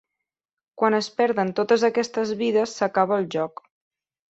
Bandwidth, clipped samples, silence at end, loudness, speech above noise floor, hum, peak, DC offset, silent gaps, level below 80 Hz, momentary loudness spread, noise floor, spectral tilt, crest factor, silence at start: 8.2 kHz; under 0.1%; 0.85 s; -23 LUFS; over 68 dB; none; -6 dBFS; under 0.1%; none; -70 dBFS; 6 LU; under -90 dBFS; -5 dB/octave; 18 dB; 0.75 s